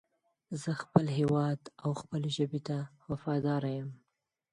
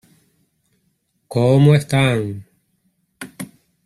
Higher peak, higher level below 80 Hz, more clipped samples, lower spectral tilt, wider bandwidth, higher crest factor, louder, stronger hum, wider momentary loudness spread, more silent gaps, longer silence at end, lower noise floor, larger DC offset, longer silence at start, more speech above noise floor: second, -10 dBFS vs -2 dBFS; second, -68 dBFS vs -52 dBFS; neither; about the same, -7 dB/octave vs -7 dB/octave; second, 10.5 kHz vs 13.5 kHz; first, 24 dB vs 18 dB; second, -33 LUFS vs -16 LUFS; neither; second, 10 LU vs 23 LU; neither; first, 0.6 s vs 0.4 s; first, -84 dBFS vs -67 dBFS; neither; second, 0.5 s vs 1.3 s; about the same, 52 dB vs 53 dB